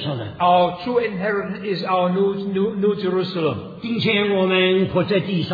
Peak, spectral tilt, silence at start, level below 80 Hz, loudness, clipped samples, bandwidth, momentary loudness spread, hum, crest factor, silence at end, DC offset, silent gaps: -6 dBFS; -8.5 dB/octave; 0 s; -56 dBFS; -20 LUFS; under 0.1%; 5 kHz; 8 LU; none; 14 dB; 0 s; under 0.1%; none